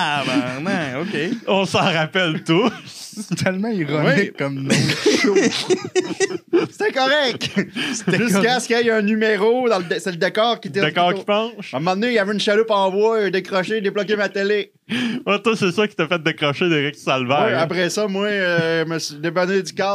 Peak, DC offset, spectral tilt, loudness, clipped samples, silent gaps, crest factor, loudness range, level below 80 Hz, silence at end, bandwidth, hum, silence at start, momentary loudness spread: -2 dBFS; under 0.1%; -4.5 dB/octave; -19 LUFS; under 0.1%; none; 18 dB; 2 LU; -68 dBFS; 0 s; 15.5 kHz; none; 0 s; 6 LU